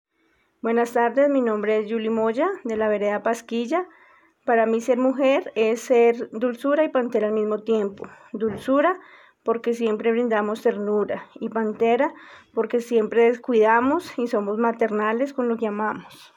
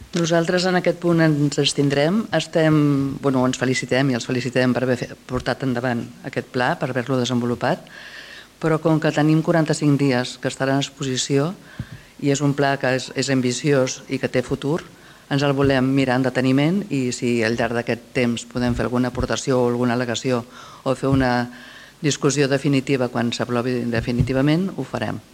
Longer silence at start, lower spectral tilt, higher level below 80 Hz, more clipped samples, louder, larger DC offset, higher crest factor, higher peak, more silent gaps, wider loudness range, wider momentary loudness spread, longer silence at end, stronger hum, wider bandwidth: first, 0.65 s vs 0 s; about the same, -5.5 dB/octave vs -5.5 dB/octave; second, -70 dBFS vs -46 dBFS; neither; about the same, -22 LUFS vs -21 LUFS; neither; about the same, 16 dB vs 16 dB; about the same, -6 dBFS vs -4 dBFS; neither; about the same, 3 LU vs 3 LU; about the same, 9 LU vs 8 LU; about the same, 0.15 s vs 0.1 s; neither; about the same, 17 kHz vs 15.5 kHz